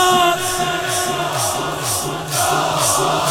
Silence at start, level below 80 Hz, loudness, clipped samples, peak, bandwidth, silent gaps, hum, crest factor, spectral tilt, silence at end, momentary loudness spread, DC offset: 0 s; -46 dBFS; -17 LUFS; under 0.1%; -4 dBFS; 19 kHz; none; none; 14 dB; -2.5 dB/octave; 0 s; 5 LU; under 0.1%